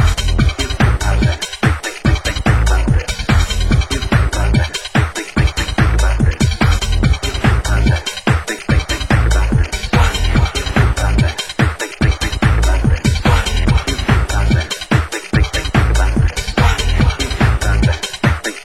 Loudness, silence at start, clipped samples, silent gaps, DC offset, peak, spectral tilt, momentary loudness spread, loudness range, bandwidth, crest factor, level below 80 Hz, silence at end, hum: -16 LUFS; 0 s; under 0.1%; none; 0.7%; 0 dBFS; -5 dB/octave; 3 LU; 1 LU; 16 kHz; 14 dB; -16 dBFS; 0 s; none